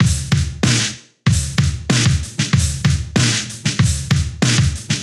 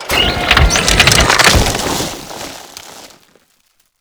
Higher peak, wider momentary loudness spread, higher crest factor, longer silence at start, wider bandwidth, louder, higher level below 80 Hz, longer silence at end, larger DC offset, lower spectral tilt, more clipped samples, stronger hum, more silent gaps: about the same, -2 dBFS vs 0 dBFS; second, 4 LU vs 21 LU; about the same, 14 dB vs 14 dB; about the same, 0 s vs 0 s; second, 13 kHz vs over 20 kHz; second, -17 LUFS vs -10 LUFS; second, -30 dBFS vs -22 dBFS; second, 0 s vs 0.95 s; neither; first, -4 dB/octave vs -2.5 dB/octave; second, under 0.1% vs 0.1%; neither; neither